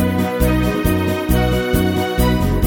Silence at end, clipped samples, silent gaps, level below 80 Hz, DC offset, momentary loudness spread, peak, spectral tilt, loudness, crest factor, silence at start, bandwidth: 0 s; under 0.1%; none; -24 dBFS; under 0.1%; 1 LU; -2 dBFS; -6 dB/octave; -17 LUFS; 14 dB; 0 s; 17 kHz